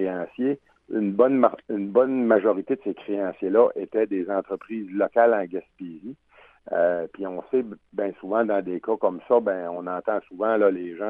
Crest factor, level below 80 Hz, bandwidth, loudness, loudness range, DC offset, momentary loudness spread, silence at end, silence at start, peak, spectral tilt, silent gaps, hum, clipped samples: 20 dB; -70 dBFS; 3.9 kHz; -24 LUFS; 4 LU; under 0.1%; 12 LU; 0 s; 0 s; -4 dBFS; -10 dB/octave; none; none; under 0.1%